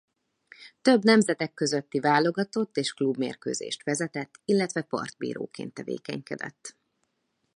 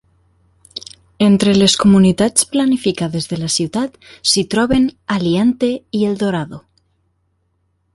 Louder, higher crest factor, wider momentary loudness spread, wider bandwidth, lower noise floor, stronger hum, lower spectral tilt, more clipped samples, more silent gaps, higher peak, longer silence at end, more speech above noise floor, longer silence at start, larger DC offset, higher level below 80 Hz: second, -27 LUFS vs -15 LUFS; first, 22 dB vs 16 dB; about the same, 14 LU vs 13 LU; about the same, 11 kHz vs 11.5 kHz; first, -77 dBFS vs -64 dBFS; neither; about the same, -4.5 dB/octave vs -4.5 dB/octave; neither; neither; second, -6 dBFS vs 0 dBFS; second, 0.85 s vs 1.35 s; about the same, 50 dB vs 50 dB; second, 0.6 s vs 0.75 s; neither; second, -74 dBFS vs -44 dBFS